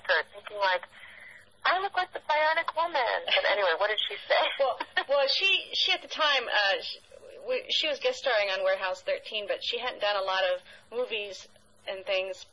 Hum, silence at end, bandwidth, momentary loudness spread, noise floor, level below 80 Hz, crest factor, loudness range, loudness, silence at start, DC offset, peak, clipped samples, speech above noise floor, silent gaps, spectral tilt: none; 0.1 s; 11.5 kHz; 14 LU; -51 dBFS; -72 dBFS; 18 dB; 5 LU; -27 LUFS; 0.05 s; under 0.1%; -12 dBFS; under 0.1%; 23 dB; none; -0.5 dB/octave